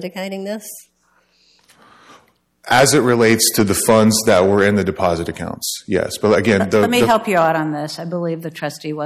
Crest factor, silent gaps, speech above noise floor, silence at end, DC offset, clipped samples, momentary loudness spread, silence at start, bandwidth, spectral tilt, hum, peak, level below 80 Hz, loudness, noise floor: 14 dB; none; 43 dB; 0 s; under 0.1%; under 0.1%; 14 LU; 0 s; 16 kHz; -4 dB/octave; none; -2 dBFS; -50 dBFS; -16 LUFS; -60 dBFS